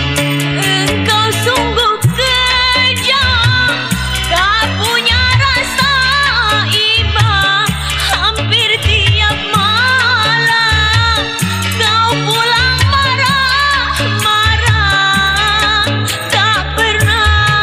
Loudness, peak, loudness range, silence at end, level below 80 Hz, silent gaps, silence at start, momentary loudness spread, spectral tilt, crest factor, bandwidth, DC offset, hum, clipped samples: -10 LUFS; -2 dBFS; 1 LU; 0 s; -24 dBFS; none; 0 s; 4 LU; -3 dB/octave; 10 dB; 15.5 kHz; under 0.1%; none; under 0.1%